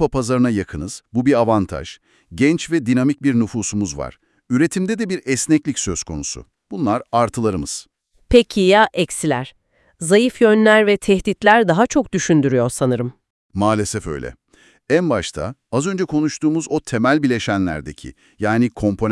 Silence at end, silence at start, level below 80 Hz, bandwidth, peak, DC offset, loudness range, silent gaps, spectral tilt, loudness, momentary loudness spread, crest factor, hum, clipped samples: 0 s; 0 s; -42 dBFS; 12 kHz; 0 dBFS; under 0.1%; 6 LU; 13.30-13.49 s; -5 dB/octave; -18 LUFS; 15 LU; 18 dB; none; under 0.1%